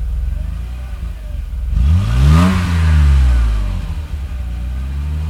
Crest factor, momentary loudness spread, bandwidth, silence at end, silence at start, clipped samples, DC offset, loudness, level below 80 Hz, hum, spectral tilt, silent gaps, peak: 14 dB; 15 LU; 11.5 kHz; 0 s; 0 s; under 0.1%; under 0.1%; -16 LUFS; -16 dBFS; none; -7 dB/octave; none; 0 dBFS